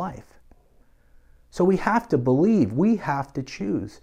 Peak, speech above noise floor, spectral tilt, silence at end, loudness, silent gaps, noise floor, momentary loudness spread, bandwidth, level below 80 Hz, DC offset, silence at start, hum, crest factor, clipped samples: -4 dBFS; 34 dB; -8 dB/octave; 0.15 s; -23 LUFS; none; -56 dBFS; 12 LU; 10 kHz; -52 dBFS; under 0.1%; 0 s; none; 20 dB; under 0.1%